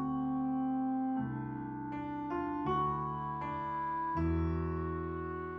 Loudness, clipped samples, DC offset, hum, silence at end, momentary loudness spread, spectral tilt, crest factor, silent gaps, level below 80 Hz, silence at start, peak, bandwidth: -36 LUFS; under 0.1%; under 0.1%; none; 0 s; 7 LU; -10 dB/octave; 14 dB; none; -48 dBFS; 0 s; -22 dBFS; 5.8 kHz